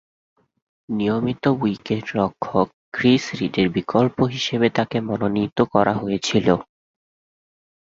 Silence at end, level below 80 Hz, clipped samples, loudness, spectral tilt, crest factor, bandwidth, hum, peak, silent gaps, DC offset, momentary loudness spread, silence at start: 1.3 s; -52 dBFS; under 0.1%; -21 LUFS; -6 dB/octave; 20 dB; 7.8 kHz; none; -2 dBFS; 2.73-2.92 s; under 0.1%; 6 LU; 0.9 s